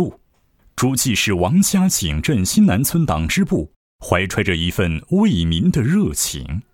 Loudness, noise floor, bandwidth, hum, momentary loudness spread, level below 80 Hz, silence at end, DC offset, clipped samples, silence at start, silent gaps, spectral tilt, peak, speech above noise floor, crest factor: -18 LUFS; -58 dBFS; 17 kHz; none; 7 LU; -34 dBFS; 0.1 s; under 0.1%; under 0.1%; 0 s; 3.76-3.99 s; -4.5 dB/octave; 0 dBFS; 41 dB; 16 dB